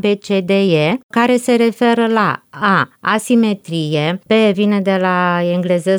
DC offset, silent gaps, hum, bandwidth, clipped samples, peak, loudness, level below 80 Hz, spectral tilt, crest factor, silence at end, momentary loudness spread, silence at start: under 0.1%; 1.03-1.09 s; none; over 20 kHz; under 0.1%; -2 dBFS; -15 LUFS; -66 dBFS; -6 dB/octave; 12 dB; 0 s; 5 LU; 0.05 s